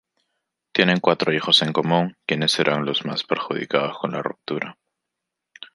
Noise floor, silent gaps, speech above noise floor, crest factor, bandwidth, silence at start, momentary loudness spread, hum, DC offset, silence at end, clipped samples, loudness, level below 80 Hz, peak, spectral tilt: -83 dBFS; none; 61 dB; 22 dB; 11.5 kHz; 0.75 s; 12 LU; none; under 0.1%; 0.1 s; under 0.1%; -21 LUFS; -66 dBFS; -2 dBFS; -4.5 dB/octave